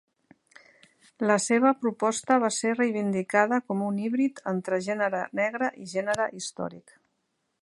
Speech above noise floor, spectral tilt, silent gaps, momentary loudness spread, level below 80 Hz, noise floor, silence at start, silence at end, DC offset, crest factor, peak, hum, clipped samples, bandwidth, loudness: 51 dB; -4.5 dB/octave; none; 8 LU; -74 dBFS; -77 dBFS; 1.2 s; 0.8 s; under 0.1%; 20 dB; -6 dBFS; none; under 0.1%; 11.5 kHz; -26 LUFS